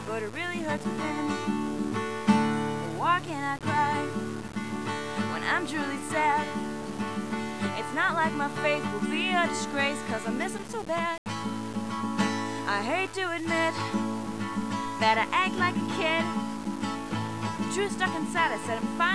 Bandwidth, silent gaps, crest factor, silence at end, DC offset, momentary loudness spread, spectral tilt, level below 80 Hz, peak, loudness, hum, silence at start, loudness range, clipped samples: 11 kHz; 11.18-11.26 s; 18 dB; 0 s; 0.4%; 8 LU; -4.5 dB/octave; -62 dBFS; -10 dBFS; -29 LUFS; none; 0 s; 2 LU; under 0.1%